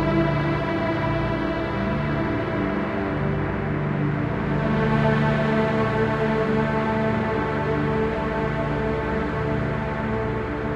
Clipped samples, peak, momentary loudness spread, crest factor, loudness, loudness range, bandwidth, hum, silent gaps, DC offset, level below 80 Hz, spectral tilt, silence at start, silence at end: under 0.1%; -8 dBFS; 4 LU; 14 dB; -23 LUFS; 3 LU; 7.6 kHz; none; none; under 0.1%; -36 dBFS; -8.5 dB/octave; 0 s; 0 s